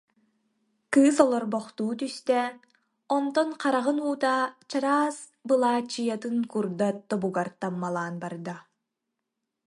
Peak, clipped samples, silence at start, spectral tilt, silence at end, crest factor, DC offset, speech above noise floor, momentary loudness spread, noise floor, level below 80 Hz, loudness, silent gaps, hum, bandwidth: -6 dBFS; under 0.1%; 0.9 s; -5 dB/octave; 1.05 s; 22 dB; under 0.1%; 58 dB; 10 LU; -84 dBFS; -76 dBFS; -27 LUFS; none; none; 11.5 kHz